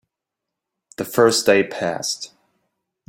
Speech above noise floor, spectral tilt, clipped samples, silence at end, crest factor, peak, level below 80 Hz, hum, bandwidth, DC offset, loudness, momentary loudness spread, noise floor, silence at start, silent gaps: 65 dB; -3 dB/octave; under 0.1%; 0.8 s; 20 dB; -2 dBFS; -64 dBFS; none; 17 kHz; under 0.1%; -19 LUFS; 15 LU; -83 dBFS; 1 s; none